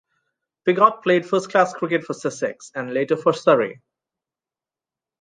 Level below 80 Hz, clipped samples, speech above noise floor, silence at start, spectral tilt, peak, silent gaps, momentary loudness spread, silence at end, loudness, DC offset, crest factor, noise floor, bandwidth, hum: -74 dBFS; under 0.1%; over 70 dB; 0.65 s; -5.5 dB/octave; -2 dBFS; none; 11 LU; 1.5 s; -20 LUFS; under 0.1%; 20 dB; under -90 dBFS; 9.6 kHz; none